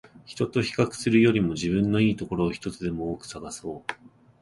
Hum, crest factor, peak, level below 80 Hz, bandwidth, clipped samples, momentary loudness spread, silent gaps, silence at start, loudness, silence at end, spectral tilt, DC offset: none; 18 dB; -8 dBFS; -50 dBFS; 11.5 kHz; under 0.1%; 15 LU; none; 0.15 s; -26 LUFS; 0.5 s; -6 dB/octave; under 0.1%